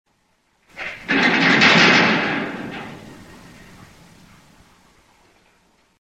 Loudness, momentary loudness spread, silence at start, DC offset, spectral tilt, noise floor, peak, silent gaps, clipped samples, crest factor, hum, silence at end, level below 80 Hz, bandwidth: -14 LUFS; 22 LU; 0.75 s; under 0.1%; -4 dB/octave; -64 dBFS; 0 dBFS; none; under 0.1%; 22 dB; none; 2.85 s; -58 dBFS; 13 kHz